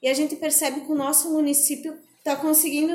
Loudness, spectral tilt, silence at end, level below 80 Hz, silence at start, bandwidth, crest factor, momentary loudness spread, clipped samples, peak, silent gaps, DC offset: -21 LUFS; -1 dB/octave; 0 s; -80 dBFS; 0 s; 17 kHz; 18 dB; 11 LU; under 0.1%; -6 dBFS; none; under 0.1%